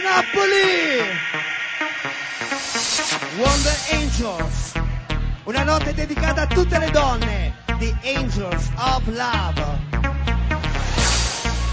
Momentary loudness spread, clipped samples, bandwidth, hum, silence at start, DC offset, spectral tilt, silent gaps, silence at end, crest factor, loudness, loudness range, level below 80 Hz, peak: 8 LU; under 0.1%; 8 kHz; none; 0 s; under 0.1%; -4 dB/octave; none; 0 s; 18 dB; -21 LUFS; 2 LU; -26 dBFS; -2 dBFS